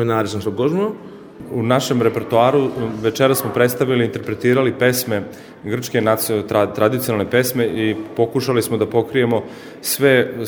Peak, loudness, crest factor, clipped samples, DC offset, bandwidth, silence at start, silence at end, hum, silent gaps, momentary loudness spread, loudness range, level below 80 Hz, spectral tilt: 0 dBFS; -18 LUFS; 18 dB; under 0.1%; under 0.1%; over 20 kHz; 0 s; 0 s; none; none; 9 LU; 2 LU; -56 dBFS; -5 dB/octave